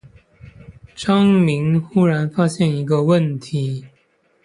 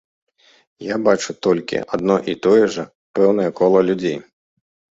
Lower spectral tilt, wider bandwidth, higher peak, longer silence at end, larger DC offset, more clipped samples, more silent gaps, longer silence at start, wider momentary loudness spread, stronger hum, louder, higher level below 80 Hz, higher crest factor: first, -7.5 dB/octave vs -5.5 dB/octave; first, 11 kHz vs 7.8 kHz; about the same, -4 dBFS vs -2 dBFS; second, 0.55 s vs 0.75 s; neither; neither; second, none vs 2.95-3.14 s; about the same, 0.7 s vs 0.8 s; about the same, 9 LU vs 11 LU; neither; about the same, -18 LUFS vs -18 LUFS; first, -52 dBFS vs -58 dBFS; about the same, 14 dB vs 18 dB